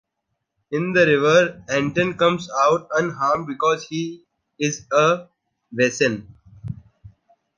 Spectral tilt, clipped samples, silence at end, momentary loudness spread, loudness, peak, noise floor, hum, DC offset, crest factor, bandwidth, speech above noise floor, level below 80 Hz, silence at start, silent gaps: -4.5 dB/octave; under 0.1%; 0.5 s; 16 LU; -20 LUFS; -4 dBFS; -77 dBFS; none; under 0.1%; 18 dB; 9.8 kHz; 58 dB; -58 dBFS; 0.7 s; none